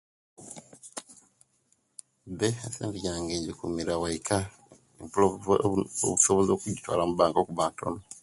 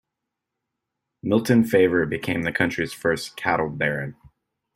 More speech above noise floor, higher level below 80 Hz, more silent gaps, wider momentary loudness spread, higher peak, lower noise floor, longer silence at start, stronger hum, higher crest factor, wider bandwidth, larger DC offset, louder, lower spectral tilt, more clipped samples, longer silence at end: second, 43 dB vs 61 dB; about the same, -54 dBFS vs -56 dBFS; neither; first, 22 LU vs 7 LU; second, -8 dBFS vs -4 dBFS; second, -71 dBFS vs -83 dBFS; second, 0.4 s vs 1.25 s; neither; about the same, 22 dB vs 20 dB; second, 11.5 kHz vs 16 kHz; neither; second, -28 LUFS vs -22 LUFS; second, -4.5 dB/octave vs -6 dB/octave; neither; second, 0.05 s vs 0.65 s